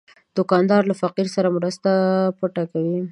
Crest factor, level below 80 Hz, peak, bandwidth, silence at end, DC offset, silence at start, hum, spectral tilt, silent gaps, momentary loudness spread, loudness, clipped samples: 18 dB; -68 dBFS; -2 dBFS; 11 kHz; 0 s; under 0.1%; 0.35 s; none; -7 dB/octave; none; 7 LU; -20 LUFS; under 0.1%